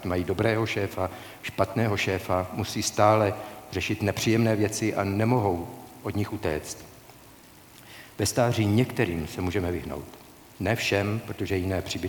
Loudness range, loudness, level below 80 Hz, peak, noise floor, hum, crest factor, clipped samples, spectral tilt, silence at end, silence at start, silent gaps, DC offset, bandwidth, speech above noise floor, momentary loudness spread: 5 LU; -27 LUFS; -52 dBFS; -6 dBFS; -51 dBFS; none; 20 dB; under 0.1%; -5.5 dB/octave; 0 s; 0 s; none; under 0.1%; 19 kHz; 25 dB; 14 LU